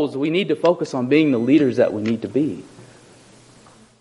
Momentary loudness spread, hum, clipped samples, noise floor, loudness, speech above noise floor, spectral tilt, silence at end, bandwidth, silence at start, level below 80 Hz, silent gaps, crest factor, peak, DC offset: 7 LU; none; under 0.1%; -49 dBFS; -19 LUFS; 30 dB; -7 dB/octave; 1.15 s; 11 kHz; 0 s; -64 dBFS; none; 16 dB; -4 dBFS; under 0.1%